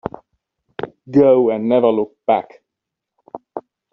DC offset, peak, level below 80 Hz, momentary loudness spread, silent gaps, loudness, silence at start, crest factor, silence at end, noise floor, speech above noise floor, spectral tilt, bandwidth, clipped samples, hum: under 0.1%; -2 dBFS; -60 dBFS; 24 LU; none; -16 LUFS; 0.05 s; 16 dB; 0.35 s; -82 dBFS; 67 dB; -6.5 dB/octave; 5.8 kHz; under 0.1%; none